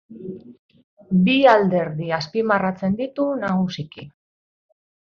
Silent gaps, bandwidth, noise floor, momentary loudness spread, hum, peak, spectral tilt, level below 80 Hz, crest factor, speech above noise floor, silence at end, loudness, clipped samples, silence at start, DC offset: 0.59-0.69 s, 0.84-0.97 s; 6.8 kHz; under -90 dBFS; 21 LU; none; -2 dBFS; -7.5 dB/octave; -60 dBFS; 20 dB; over 70 dB; 1 s; -20 LUFS; under 0.1%; 0.1 s; under 0.1%